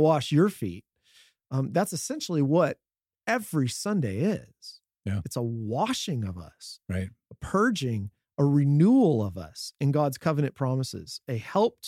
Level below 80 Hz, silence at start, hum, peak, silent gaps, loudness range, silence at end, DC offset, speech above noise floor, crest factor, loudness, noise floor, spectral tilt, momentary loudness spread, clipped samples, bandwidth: -62 dBFS; 0 s; none; -10 dBFS; none; 6 LU; 0 s; under 0.1%; 35 dB; 18 dB; -27 LUFS; -61 dBFS; -6.5 dB/octave; 16 LU; under 0.1%; 15.5 kHz